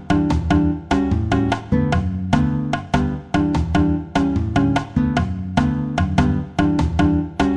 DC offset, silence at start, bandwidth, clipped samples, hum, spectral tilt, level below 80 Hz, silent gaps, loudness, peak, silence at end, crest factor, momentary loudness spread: under 0.1%; 0 s; 10 kHz; under 0.1%; none; -7.5 dB/octave; -28 dBFS; none; -19 LUFS; -4 dBFS; 0 s; 16 dB; 3 LU